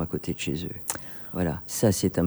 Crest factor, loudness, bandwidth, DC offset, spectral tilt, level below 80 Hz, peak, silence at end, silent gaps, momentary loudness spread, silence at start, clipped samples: 20 dB; -28 LUFS; over 20 kHz; under 0.1%; -5 dB/octave; -50 dBFS; -8 dBFS; 0 s; none; 9 LU; 0 s; under 0.1%